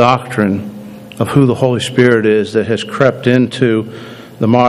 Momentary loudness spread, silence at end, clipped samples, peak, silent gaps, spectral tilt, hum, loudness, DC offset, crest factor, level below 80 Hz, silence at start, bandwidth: 17 LU; 0 s; 0.3%; 0 dBFS; none; -6.5 dB/octave; none; -13 LUFS; under 0.1%; 12 dB; -52 dBFS; 0 s; 13.5 kHz